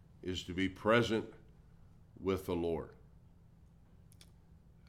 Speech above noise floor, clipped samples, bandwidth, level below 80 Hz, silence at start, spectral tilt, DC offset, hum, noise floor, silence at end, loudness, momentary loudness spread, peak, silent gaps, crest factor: 27 dB; under 0.1%; 16 kHz; -60 dBFS; 0.2 s; -6 dB/octave; under 0.1%; none; -61 dBFS; 0.35 s; -36 LUFS; 12 LU; -16 dBFS; none; 22 dB